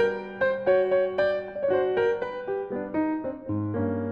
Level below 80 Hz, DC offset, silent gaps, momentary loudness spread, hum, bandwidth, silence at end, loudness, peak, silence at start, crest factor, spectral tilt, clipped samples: -60 dBFS; under 0.1%; none; 8 LU; none; 6.6 kHz; 0 s; -26 LUFS; -12 dBFS; 0 s; 14 dB; -8.5 dB/octave; under 0.1%